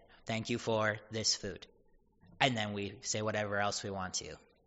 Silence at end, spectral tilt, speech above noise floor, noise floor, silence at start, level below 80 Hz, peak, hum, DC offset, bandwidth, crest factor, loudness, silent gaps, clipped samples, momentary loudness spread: 0.3 s; -2.5 dB/octave; 32 dB; -67 dBFS; 0.25 s; -66 dBFS; -10 dBFS; none; under 0.1%; 8 kHz; 26 dB; -35 LUFS; none; under 0.1%; 8 LU